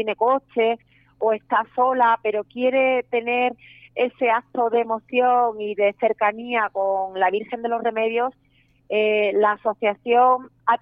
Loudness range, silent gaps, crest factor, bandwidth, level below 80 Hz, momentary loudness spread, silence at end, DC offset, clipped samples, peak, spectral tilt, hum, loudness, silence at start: 2 LU; none; 14 dB; 5 kHz; -68 dBFS; 7 LU; 0.05 s; under 0.1%; under 0.1%; -6 dBFS; -7.5 dB/octave; none; -21 LUFS; 0 s